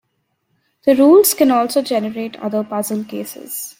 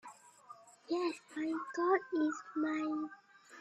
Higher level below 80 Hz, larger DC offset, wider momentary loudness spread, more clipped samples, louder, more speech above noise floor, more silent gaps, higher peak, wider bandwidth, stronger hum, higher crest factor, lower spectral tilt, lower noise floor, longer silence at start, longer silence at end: first, -64 dBFS vs -86 dBFS; neither; second, 16 LU vs 24 LU; neither; first, -16 LUFS vs -37 LUFS; first, 53 dB vs 22 dB; neither; first, 0 dBFS vs -18 dBFS; first, 16.5 kHz vs 10.5 kHz; neither; about the same, 16 dB vs 20 dB; about the same, -4 dB/octave vs -4 dB/octave; first, -69 dBFS vs -58 dBFS; first, 0.85 s vs 0.05 s; about the same, 0.1 s vs 0 s